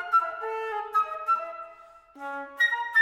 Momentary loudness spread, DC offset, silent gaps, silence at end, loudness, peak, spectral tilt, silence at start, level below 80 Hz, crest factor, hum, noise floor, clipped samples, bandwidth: 15 LU; under 0.1%; none; 0 s; -27 LUFS; -12 dBFS; -0.5 dB/octave; 0 s; -72 dBFS; 16 dB; none; -51 dBFS; under 0.1%; 15.5 kHz